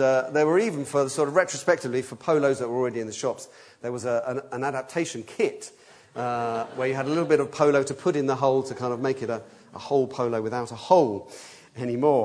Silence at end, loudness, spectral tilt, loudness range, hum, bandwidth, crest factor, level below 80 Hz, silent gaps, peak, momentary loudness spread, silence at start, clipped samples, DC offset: 0 s; -25 LUFS; -5.5 dB/octave; 5 LU; none; 11 kHz; 20 dB; -72 dBFS; none; -4 dBFS; 13 LU; 0 s; under 0.1%; under 0.1%